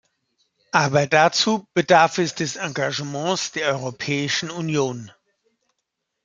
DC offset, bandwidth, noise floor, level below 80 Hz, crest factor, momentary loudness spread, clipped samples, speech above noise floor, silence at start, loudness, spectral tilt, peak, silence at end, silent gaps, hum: under 0.1%; 9.4 kHz; -79 dBFS; -64 dBFS; 22 dB; 9 LU; under 0.1%; 58 dB; 0.75 s; -21 LUFS; -4 dB/octave; -2 dBFS; 1.15 s; none; none